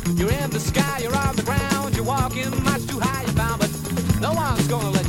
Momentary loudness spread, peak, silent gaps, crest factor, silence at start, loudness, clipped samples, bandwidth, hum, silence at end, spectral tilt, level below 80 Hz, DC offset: 2 LU; -6 dBFS; none; 16 dB; 0 s; -22 LUFS; under 0.1%; 17 kHz; none; 0 s; -5 dB/octave; -34 dBFS; under 0.1%